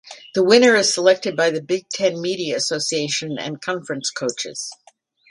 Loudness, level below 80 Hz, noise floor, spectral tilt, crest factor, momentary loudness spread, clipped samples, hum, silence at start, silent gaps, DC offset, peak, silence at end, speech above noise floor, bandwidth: -19 LUFS; -68 dBFS; -55 dBFS; -3 dB/octave; 20 dB; 13 LU; under 0.1%; none; 0.05 s; none; under 0.1%; 0 dBFS; 0.55 s; 35 dB; 11.5 kHz